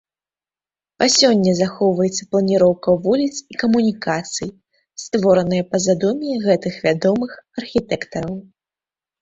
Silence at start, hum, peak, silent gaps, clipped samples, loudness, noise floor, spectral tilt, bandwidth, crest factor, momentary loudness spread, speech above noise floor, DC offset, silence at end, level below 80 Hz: 1 s; none; -2 dBFS; none; under 0.1%; -18 LUFS; under -90 dBFS; -4.5 dB/octave; 8.2 kHz; 18 dB; 12 LU; over 72 dB; under 0.1%; 0.8 s; -54 dBFS